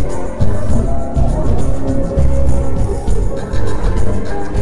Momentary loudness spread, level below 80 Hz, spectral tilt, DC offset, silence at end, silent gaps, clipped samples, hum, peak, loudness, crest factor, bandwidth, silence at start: 5 LU; -18 dBFS; -8 dB/octave; under 0.1%; 0 s; none; under 0.1%; none; -2 dBFS; -18 LUFS; 8 dB; 11 kHz; 0 s